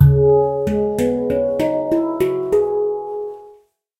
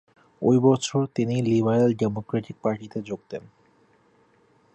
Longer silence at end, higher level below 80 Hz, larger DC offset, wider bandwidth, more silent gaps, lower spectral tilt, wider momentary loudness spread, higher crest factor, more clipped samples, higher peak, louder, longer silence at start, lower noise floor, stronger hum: second, 0.5 s vs 1.35 s; first, -34 dBFS vs -62 dBFS; neither; first, 15 kHz vs 8.8 kHz; neither; first, -9 dB/octave vs -7 dB/octave; second, 12 LU vs 15 LU; about the same, 18 dB vs 18 dB; neither; first, 0 dBFS vs -8 dBFS; first, -18 LUFS vs -24 LUFS; second, 0 s vs 0.4 s; second, -50 dBFS vs -61 dBFS; neither